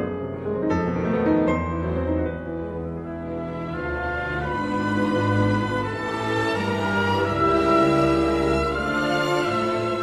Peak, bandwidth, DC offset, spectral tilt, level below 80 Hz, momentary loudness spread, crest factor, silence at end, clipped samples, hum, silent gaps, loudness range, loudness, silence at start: -8 dBFS; 13 kHz; under 0.1%; -6.5 dB/octave; -40 dBFS; 10 LU; 16 dB; 0 s; under 0.1%; none; none; 6 LU; -23 LUFS; 0 s